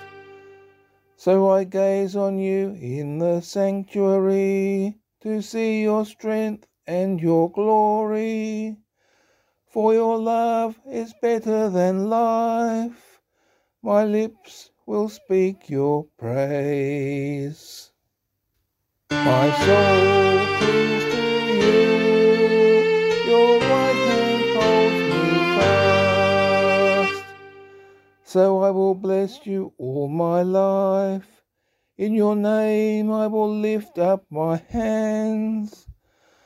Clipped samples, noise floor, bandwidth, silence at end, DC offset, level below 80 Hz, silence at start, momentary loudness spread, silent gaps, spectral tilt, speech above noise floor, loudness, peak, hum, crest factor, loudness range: under 0.1%; -76 dBFS; 14 kHz; 0.55 s; under 0.1%; -58 dBFS; 0 s; 12 LU; none; -6 dB/octave; 55 dB; -20 LUFS; -4 dBFS; none; 16 dB; 7 LU